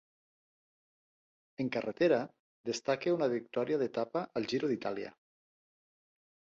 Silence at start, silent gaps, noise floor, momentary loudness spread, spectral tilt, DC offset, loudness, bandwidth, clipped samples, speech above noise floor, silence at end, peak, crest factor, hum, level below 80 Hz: 1.6 s; 2.39-2.64 s; under -90 dBFS; 13 LU; -5.5 dB/octave; under 0.1%; -34 LUFS; 7.8 kHz; under 0.1%; over 57 dB; 1.45 s; -16 dBFS; 20 dB; none; -78 dBFS